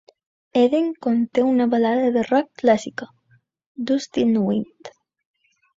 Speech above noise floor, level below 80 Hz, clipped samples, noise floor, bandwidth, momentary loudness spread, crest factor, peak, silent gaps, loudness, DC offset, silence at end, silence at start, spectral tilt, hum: 41 dB; -64 dBFS; under 0.1%; -61 dBFS; 7.8 kHz; 13 LU; 18 dB; -4 dBFS; 3.66-3.75 s; -20 LUFS; under 0.1%; 0.9 s; 0.55 s; -6 dB/octave; none